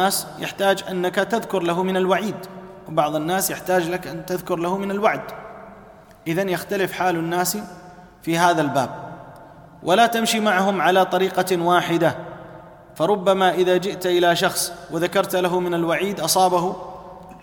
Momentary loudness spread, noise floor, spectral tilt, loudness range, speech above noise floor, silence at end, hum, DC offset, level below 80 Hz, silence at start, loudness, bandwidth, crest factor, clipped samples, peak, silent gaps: 17 LU; -45 dBFS; -4 dB/octave; 5 LU; 25 dB; 0.05 s; none; under 0.1%; -58 dBFS; 0 s; -21 LUFS; 19 kHz; 18 dB; under 0.1%; -4 dBFS; none